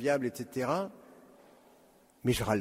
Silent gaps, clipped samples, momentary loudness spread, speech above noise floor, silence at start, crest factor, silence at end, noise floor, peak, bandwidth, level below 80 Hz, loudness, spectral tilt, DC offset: none; under 0.1%; 10 LU; 31 dB; 0 s; 20 dB; 0 s; -62 dBFS; -14 dBFS; 16 kHz; -58 dBFS; -33 LUFS; -5.5 dB/octave; under 0.1%